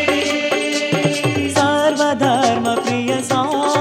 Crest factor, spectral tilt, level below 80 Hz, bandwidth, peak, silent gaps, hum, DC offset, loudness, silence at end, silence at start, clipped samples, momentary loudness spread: 14 dB; -4 dB/octave; -58 dBFS; 16 kHz; -2 dBFS; none; none; under 0.1%; -17 LUFS; 0 s; 0 s; under 0.1%; 3 LU